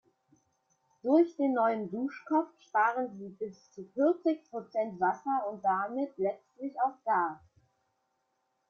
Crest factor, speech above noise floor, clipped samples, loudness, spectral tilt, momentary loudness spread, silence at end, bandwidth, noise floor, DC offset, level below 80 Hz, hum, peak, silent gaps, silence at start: 18 dB; 48 dB; under 0.1%; -31 LUFS; -7.5 dB/octave; 13 LU; 1.35 s; 6.6 kHz; -79 dBFS; under 0.1%; -80 dBFS; none; -14 dBFS; none; 1.05 s